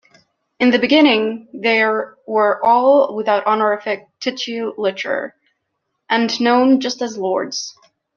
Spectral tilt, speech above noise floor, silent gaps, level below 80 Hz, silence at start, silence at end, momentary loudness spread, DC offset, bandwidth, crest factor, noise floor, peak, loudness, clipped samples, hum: -3.5 dB/octave; 57 dB; none; -66 dBFS; 0.6 s; 0.45 s; 12 LU; under 0.1%; 7.2 kHz; 16 dB; -74 dBFS; -2 dBFS; -17 LUFS; under 0.1%; none